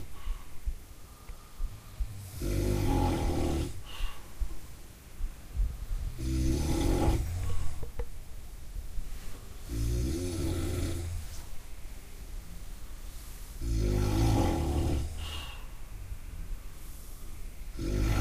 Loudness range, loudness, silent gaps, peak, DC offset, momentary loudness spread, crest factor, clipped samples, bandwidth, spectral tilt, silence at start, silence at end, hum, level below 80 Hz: 6 LU; -34 LUFS; none; -14 dBFS; under 0.1%; 19 LU; 18 dB; under 0.1%; 15.5 kHz; -6 dB/octave; 0 s; 0 s; none; -36 dBFS